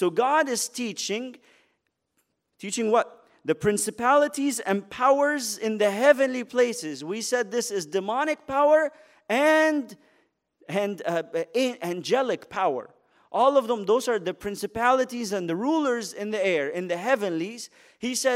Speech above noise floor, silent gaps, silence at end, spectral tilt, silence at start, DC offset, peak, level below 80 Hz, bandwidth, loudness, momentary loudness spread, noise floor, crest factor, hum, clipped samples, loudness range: 50 dB; none; 0 s; -3.5 dB/octave; 0 s; under 0.1%; -6 dBFS; -66 dBFS; 16 kHz; -25 LUFS; 11 LU; -75 dBFS; 18 dB; none; under 0.1%; 5 LU